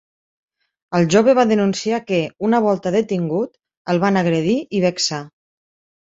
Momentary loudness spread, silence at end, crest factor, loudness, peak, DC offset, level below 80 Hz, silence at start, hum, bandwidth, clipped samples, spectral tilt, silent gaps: 9 LU; 0.75 s; 16 dB; -18 LUFS; -2 dBFS; under 0.1%; -58 dBFS; 0.9 s; none; 8 kHz; under 0.1%; -5.5 dB/octave; 3.77-3.85 s